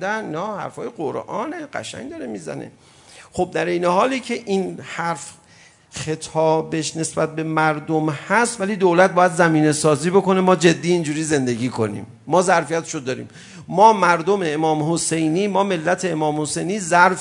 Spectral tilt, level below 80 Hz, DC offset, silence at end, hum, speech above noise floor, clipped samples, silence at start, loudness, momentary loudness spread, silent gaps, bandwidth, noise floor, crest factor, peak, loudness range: -5 dB/octave; -60 dBFS; under 0.1%; 0 s; none; 31 dB; under 0.1%; 0 s; -19 LUFS; 15 LU; none; 11 kHz; -50 dBFS; 20 dB; 0 dBFS; 7 LU